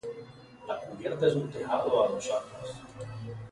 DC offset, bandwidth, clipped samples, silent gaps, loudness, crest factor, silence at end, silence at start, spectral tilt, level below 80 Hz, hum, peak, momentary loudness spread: under 0.1%; 11.5 kHz; under 0.1%; none; -31 LUFS; 20 dB; 0 s; 0.05 s; -5.5 dB/octave; -64 dBFS; none; -12 dBFS; 16 LU